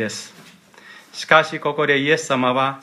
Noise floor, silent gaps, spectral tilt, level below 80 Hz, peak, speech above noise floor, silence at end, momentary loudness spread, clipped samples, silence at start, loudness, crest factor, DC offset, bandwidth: -46 dBFS; none; -4 dB/octave; -70 dBFS; 0 dBFS; 27 dB; 0.05 s; 17 LU; under 0.1%; 0 s; -18 LUFS; 20 dB; under 0.1%; 14 kHz